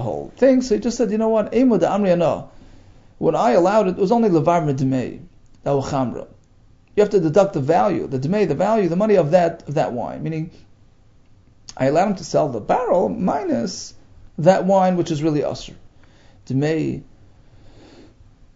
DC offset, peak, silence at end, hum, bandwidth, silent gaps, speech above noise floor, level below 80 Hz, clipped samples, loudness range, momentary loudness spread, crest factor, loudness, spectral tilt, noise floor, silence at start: under 0.1%; 0 dBFS; 1.55 s; none; 7.8 kHz; none; 33 dB; -48 dBFS; under 0.1%; 4 LU; 12 LU; 18 dB; -19 LUFS; -7 dB/octave; -51 dBFS; 0 s